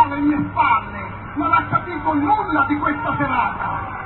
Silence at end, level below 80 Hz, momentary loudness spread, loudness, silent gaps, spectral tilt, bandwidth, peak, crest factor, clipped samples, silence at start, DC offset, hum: 0 s; -40 dBFS; 8 LU; -19 LUFS; none; -11.5 dB/octave; 4.2 kHz; -4 dBFS; 16 dB; under 0.1%; 0 s; under 0.1%; none